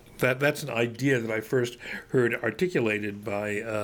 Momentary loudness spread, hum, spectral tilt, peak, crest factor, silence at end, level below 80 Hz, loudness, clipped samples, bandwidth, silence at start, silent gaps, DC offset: 6 LU; none; -5.5 dB/octave; -8 dBFS; 20 dB; 0 s; -60 dBFS; -27 LUFS; under 0.1%; over 20 kHz; 0.05 s; none; under 0.1%